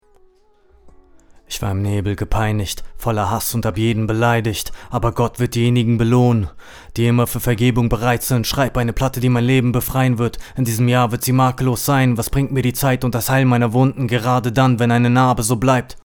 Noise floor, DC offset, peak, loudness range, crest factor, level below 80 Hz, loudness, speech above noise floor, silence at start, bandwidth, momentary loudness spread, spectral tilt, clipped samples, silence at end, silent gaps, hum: -53 dBFS; under 0.1%; 0 dBFS; 4 LU; 16 dB; -34 dBFS; -17 LUFS; 36 dB; 0.85 s; over 20 kHz; 7 LU; -6 dB/octave; under 0.1%; 0.05 s; none; none